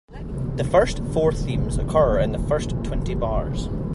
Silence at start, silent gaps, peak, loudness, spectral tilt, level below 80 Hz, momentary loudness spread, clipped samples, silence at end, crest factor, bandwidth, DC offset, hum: 0.1 s; none; -6 dBFS; -23 LUFS; -7 dB/octave; -30 dBFS; 8 LU; under 0.1%; 0 s; 16 dB; 11.5 kHz; under 0.1%; none